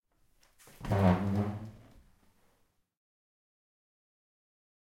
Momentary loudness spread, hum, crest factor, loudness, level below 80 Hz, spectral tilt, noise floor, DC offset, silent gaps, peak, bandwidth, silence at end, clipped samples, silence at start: 19 LU; none; 24 dB; -30 LUFS; -58 dBFS; -8.5 dB/octave; -73 dBFS; under 0.1%; none; -14 dBFS; 16 kHz; 3.15 s; under 0.1%; 0.8 s